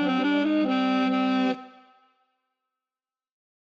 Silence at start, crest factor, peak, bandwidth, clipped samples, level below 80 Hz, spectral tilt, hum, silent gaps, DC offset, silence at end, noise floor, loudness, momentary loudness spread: 0 s; 12 dB; -14 dBFS; 7.2 kHz; under 0.1%; -78 dBFS; -6.5 dB/octave; none; none; under 0.1%; 2 s; under -90 dBFS; -24 LUFS; 4 LU